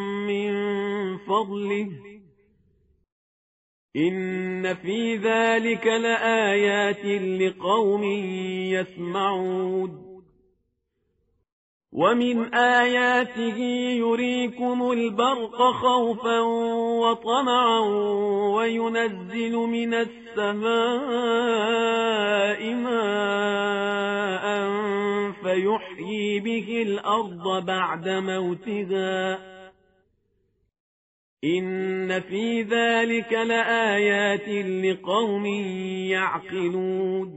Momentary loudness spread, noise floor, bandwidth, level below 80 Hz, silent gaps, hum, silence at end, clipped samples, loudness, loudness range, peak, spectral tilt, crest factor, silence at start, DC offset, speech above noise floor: 7 LU; -74 dBFS; 8 kHz; -68 dBFS; 3.12-3.89 s, 11.52-11.81 s, 30.80-31.37 s; none; 0 s; under 0.1%; -24 LUFS; 8 LU; -8 dBFS; -3 dB/octave; 18 dB; 0 s; under 0.1%; 51 dB